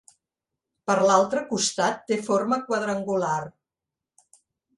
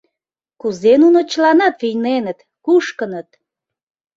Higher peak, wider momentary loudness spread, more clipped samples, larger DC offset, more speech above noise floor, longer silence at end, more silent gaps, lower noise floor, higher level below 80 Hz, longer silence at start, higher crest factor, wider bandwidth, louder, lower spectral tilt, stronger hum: about the same, -4 dBFS vs -2 dBFS; second, 9 LU vs 15 LU; neither; neither; second, 65 dB vs 69 dB; first, 1.3 s vs 0.95 s; neither; first, -88 dBFS vs -83 dBFS; second, -70 dBFS vs -64 dBFS; first, 0.85 s vs 0.65 s; first, 22 dB vs 14 dB; first, 11.5 kHz vs 7.6 kHz; second, -24 LUFS vs -15 LUFS; second, -3.5 dB/octave vs -5 dB/octave; neither